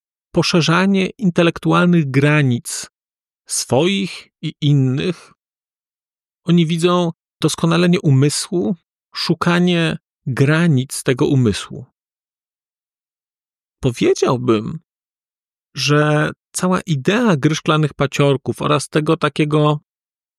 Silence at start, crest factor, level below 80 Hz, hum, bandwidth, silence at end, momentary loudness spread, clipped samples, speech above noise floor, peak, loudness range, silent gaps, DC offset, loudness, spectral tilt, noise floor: 0.35 s; 14 dB; -52 dBFS; none; 13.5 kHz; 0.6 s; 12 LU; under 0.1%; over 74 dB; -4 dBFS; 5 LU; 6.09-6.14 s, 13.00-13.04 s; under 0.1%; -17 LUFS; -5.5 dB/octave; under -90 dBFS